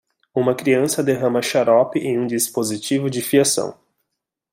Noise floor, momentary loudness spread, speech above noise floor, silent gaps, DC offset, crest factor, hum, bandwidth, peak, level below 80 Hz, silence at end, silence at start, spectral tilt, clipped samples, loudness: -80 dBFS; 6 LU; 61 dB; none; under 0.1%; 18 dB; none; 16.5 kHz; -2 dBFS; -64 dBFS; 0.8 s; 0.35 s; -4 dB/octave; under 0.1%; -19 LUFS